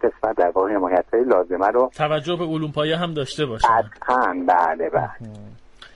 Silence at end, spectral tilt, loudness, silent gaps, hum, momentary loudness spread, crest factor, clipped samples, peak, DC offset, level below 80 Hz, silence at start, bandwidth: 0.1 s; -6 dB/octave; -20 LUFS; none; none; 6 LU; 16 dB; under 0.1%; -6 dBFS; under 0.1%; -48 dBFS; 0 s; 11.5 kHz